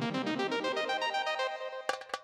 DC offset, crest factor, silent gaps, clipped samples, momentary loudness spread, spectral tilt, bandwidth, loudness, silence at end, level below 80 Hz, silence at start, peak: under 0.1%; 18 dB; none; under 0.1%; 5 LU; -4 dB/octave; 15.5 kHz; -33 LUFS; 0 s; -82 dBFS; 0 s; -16 dBFS